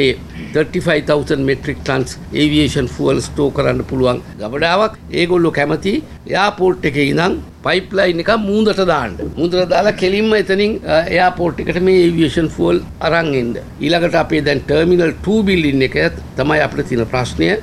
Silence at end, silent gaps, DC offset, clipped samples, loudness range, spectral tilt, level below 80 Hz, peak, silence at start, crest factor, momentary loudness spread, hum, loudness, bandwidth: 0 s; none; under 0.1%; under 0.1%; 2 LU; -6 dB/octave; -34 dBFS; 0 dBFS; 0 s; 14 dB; 6 LU; none; -15 LUFS; 13.5 kHz